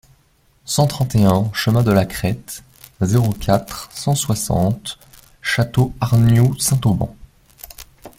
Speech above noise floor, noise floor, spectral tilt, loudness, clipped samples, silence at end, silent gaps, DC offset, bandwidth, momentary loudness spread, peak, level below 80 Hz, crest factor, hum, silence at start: 40 dB; -57 dBFS; -5.5 dB/octave; -18 LUFS; under 0.1%; 0.1 s; none; under 0.1%; 16.5 kHz; 19 LU; -2 dBFS; -40 dBFS; 16 dB; none; 0.65 s